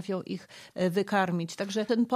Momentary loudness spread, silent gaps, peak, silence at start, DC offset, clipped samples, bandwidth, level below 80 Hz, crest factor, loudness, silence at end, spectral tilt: 12 LU; none; -12 dBFS; 0 s; under 0.1%; under 0.1%; 15 kHz; -78 dBFS; 16 dB; -30 LUFS; 0 s; -6 dB/octave